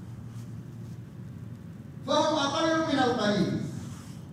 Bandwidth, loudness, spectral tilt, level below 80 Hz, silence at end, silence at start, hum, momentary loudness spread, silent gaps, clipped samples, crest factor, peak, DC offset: 15.5 kHz; -27 LUFS; -5 dB/octave; -62 dBFS; 0 s; 0 s; none; 17 LU; none; under 0.1%; 18 dB; -12 dBFS; under 0.1%